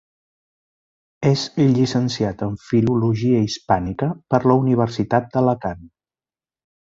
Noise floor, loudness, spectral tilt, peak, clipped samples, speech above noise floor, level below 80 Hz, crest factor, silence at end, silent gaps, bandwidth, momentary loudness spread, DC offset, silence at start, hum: under -90 dBFS; -20 LUFS; -7 dB/octave; -2 dBFS; under 0.1%; over 71 dB; -48 dBFS; 18 dB; 1.05 s; none; 7.8 kHz; 8 LU; under 0.1%; 1.2 s; none